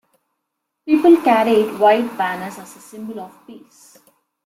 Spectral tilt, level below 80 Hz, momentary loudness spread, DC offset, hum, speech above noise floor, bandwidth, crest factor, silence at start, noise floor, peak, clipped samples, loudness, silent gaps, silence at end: -5.5 dB/octave; -64 dBFS; 24 LU; under 0.1%; none; 60 dB; 15.5 kHz; 16 dB; 0.85 s; -77 dBFS; -2 dBFS; under 0.1%; -15 LUFS; none; 0.9 s